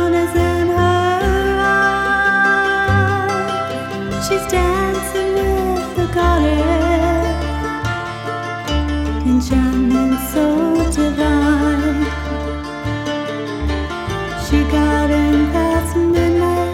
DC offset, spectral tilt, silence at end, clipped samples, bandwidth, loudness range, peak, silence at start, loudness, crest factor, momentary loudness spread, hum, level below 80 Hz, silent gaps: under 0.1%; -6 dB/octave; 0 s; under 0.1%; 16.5 kHz; 4 LU; -2 dBFS; 0 s; -17 LUFS; 14 dB; 8 LU; none; -26 dBFS; none